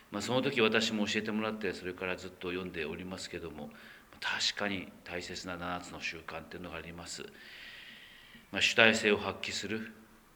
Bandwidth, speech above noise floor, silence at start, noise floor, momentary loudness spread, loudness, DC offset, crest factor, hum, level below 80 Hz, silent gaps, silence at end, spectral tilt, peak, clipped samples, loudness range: over 20 kHz; 21 dB; 0 s; -55 dBFS; 20 LU; -33 LUFS; under 0.1%; 30 dB; none; -66 dBFS; none; 0.3 s; -3.5 dB/octave; -6 dBFS; under 0.1%; 10 LU